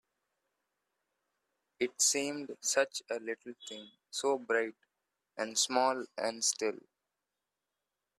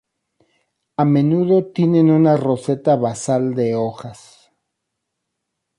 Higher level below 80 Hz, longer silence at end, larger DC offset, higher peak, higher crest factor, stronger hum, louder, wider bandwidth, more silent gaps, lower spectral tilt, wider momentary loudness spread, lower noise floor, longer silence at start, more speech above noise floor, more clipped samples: second, -86 dBFS vs -62 dBFS; second, 1.4 s vs 1.65 s; neither; second, -16 dBFS vs -4 dBFS; first, 22 dB vs 16 dB; first, 50 Hz at -95 dBFS vs none; second, -33 LUFS vs -17 LUFS; first, 15 kHz vs 11.5 kHz; neither; second, -0.5 dB/octave vs -8 dB/octave; first, 17 LU vs 11 LU; first, -89 dBFS vs -77 dBFS; first, 1.8 s vs 1 s; second, 54 dB vs 61 dB; neither